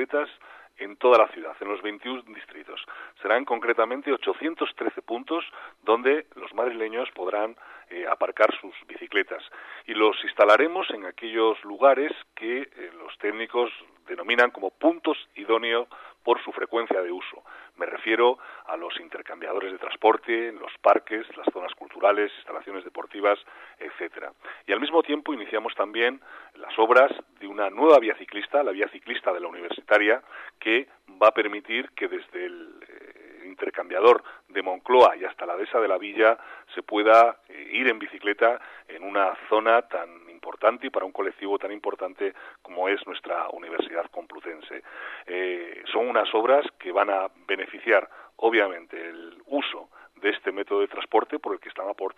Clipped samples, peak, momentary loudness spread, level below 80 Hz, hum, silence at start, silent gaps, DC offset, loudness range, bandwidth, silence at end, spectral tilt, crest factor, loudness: under 0.1%; -6 dBFS; 18 LU; -76 dBFS; none; 0 s; none; under 0.1%; 6 LU; 8.4 kHz; 0.05 s; -4 dB/octave; 20 dB; -25 LUFS